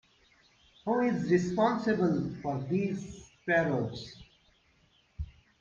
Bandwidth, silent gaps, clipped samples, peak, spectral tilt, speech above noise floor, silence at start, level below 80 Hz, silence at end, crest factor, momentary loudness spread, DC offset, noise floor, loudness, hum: 7.4 kHz; none; under 0.1%; -14 dBFS; -7 dB/octave; 38 dB; 0.85 s; -56 dBFS; 0.3 s; 18 dB; 17 LU; under 0.1%; -67 dBFS; -30 LUFS; none